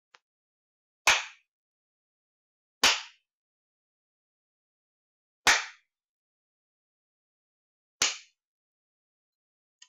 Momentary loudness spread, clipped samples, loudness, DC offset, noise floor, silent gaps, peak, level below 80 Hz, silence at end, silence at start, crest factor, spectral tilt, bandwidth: 17 LU; under 0.1%; -25 LUFS; under 0.1%; -49 dBFS; 1.48-2.81 s, 3.33-5.44 s, 6.09-8.00 s; -14 dBFS; -66 dBFS; 1.7 s; 1.05 s; 22 dB; 1.5 dB/octave; 13.5 kHz